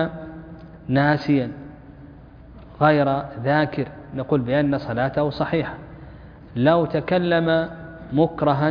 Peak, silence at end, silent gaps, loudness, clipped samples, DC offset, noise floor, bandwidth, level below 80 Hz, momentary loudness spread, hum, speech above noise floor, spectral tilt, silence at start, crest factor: -4 dBFS; 0 s; none; -21 LUFS; under 0.1%; under 0.1%; -43 dBFS; 5.2 kHz; -48 dBFS; 20 LU; none; 23 dB; -9 dB/octave; 0 s; 18 dB